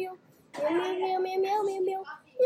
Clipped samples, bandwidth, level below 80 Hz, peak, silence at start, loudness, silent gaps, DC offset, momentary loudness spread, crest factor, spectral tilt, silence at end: under 0.1%; 13.5 kHz; -84 dBFS; -16 dBFS; 0 s; -30 LUFS; none; under 0.1%; 11 LU; 14 dB; -4.5 dB/octave; 0 s